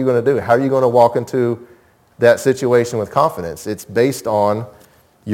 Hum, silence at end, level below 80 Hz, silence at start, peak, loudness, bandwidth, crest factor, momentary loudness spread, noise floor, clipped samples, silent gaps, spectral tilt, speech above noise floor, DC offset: none; 0 s; -56 dBFS; 0 s; 0 dBFS; -16 LUFS; 17 kHz; 16 dB; 13 LU; -46 dBFS; under 0.1%; none; -6 dB/octave; 30 dB; under 0.1%